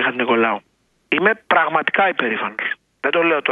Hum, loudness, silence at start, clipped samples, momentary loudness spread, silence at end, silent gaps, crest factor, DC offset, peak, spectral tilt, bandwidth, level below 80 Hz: none; -18 LUFS; 0 s; under 0.1%; 8 LU; 0 s; none; 18 dB; under 0.1%; 0 dBFS; -6.5 dB/octave; 4.9 kHz; -68 dBFS